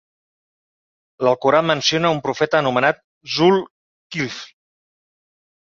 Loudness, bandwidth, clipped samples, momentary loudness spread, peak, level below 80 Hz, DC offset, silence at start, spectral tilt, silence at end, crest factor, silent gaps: -18 LUFS; 7.4 kHz; under 0.1%; 13 LU; -2 dBFS; -60 dBFS; under 0.1%; 1.2 s; -4.5 dB/octave; 1.3 s; 20 dB; 3.04-3.21 s, 3.70-4.10 s